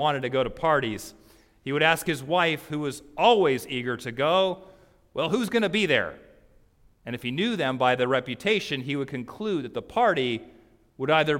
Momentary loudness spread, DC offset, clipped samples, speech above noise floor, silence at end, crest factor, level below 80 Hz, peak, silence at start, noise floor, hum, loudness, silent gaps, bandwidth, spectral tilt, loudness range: 12 LU; under 0.1%; under 0.1%; 34 dB; 0 s; 20 dB; -58 dBFS; -6 dBFS; 0 s; -59 dBFS; none; -25 LUFS; none; 16.5 kHz; -5 dB/octave; 3 LU